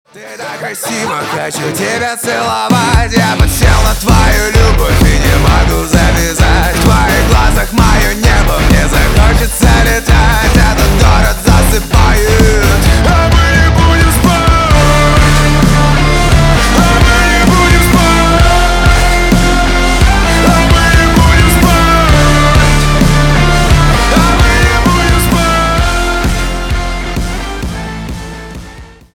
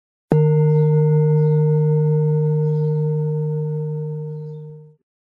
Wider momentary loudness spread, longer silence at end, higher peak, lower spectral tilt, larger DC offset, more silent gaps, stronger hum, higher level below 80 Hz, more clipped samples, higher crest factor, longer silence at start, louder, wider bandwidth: second, 9 LU vs 13 LU; about the same, 0.3 s vs 0.4 s; first, 0 dBFS vs -4 dBFS; second, -4.5 dB/octave vs -12.5 dB/octave; neither; neither; neither; first, -12 dBFS vs -56 dBFS; neither; second, 8 dB vs 16 dB; second, 0.15 s vs 0.3 s; first, -9 LUFS vs -18 LUFS; first, 19.5 kHz vs 2.2 kHz